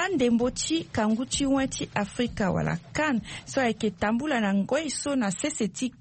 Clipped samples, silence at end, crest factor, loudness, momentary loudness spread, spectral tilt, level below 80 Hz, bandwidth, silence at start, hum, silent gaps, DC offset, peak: under 0.1%; 0.1 s; 16 dB; -27 LUFS; 5 LU; -4.5 dB/octave; -50 dBFS; 8.8 kHz; 0 s; none; none; under 0.1%; -12 dBFS